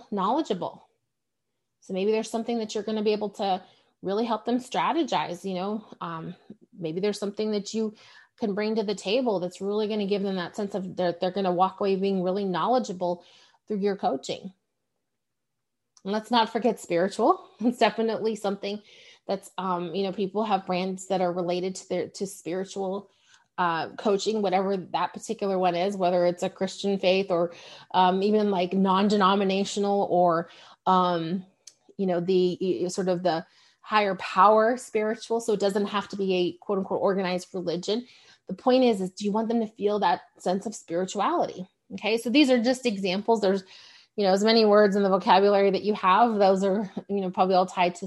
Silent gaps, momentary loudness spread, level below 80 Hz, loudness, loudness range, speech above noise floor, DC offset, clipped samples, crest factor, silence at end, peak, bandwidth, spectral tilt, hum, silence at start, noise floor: none; 11 LU; -74 dBFS; -26 LUFS; 7 LU; 59 dB; under 0.1%; under 0.1%; 20 dB; 0 s; -6 dBFS; 12 kHz; -5.5 dB/octave; none; 0 s; -85 dBFS